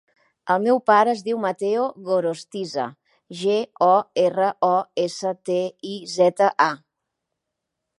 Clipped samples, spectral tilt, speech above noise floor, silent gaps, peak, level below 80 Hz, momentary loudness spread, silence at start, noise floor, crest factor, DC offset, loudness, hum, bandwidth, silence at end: under 0.1%; -5 dB/octave; 61 dB; none; -2 dBFS; -78 dBFS; 12 LU; 0.45 s; -81 dBFS; 20 dB; under 0.1%; -21 LUFS; none; 11.5 kHz; 1.2 s